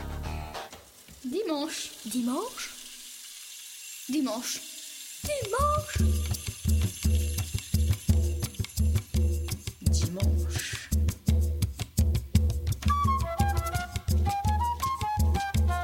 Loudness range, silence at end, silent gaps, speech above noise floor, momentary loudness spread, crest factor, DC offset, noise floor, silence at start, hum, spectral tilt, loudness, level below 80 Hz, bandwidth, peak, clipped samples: 6 LU; 0 s; none; 21 dB; 13 LU; 18 dB; under 0.1%; -50 dBFS; 0 s; none; -5 dB/octave; -29 LUFS; -32 dBFS; 17 kHz; -10 dBFS; under 0.1%